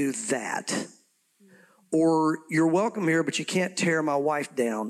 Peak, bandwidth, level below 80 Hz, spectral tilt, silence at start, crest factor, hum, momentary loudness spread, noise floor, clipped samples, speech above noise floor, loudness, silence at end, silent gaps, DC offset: -14 dBFS; 13.5 kHz; -80 dBFS; -4.5 dB/octave; 0 s; 12 dB; none; 7 LU; -63 dBFS; under 0.1%; 37 dB; -26 LUFS; 0 s; none; under 0.1%